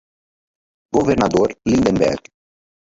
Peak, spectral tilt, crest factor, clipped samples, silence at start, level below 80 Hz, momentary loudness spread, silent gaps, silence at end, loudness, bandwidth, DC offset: -2 dBFS; -6 dB/octave; 18 dB; under 0.1%; 0.95 s; -42 dBFS; 5 LU; none; 0.7 s; -17 LUFS; 8 kHz; under 0.1%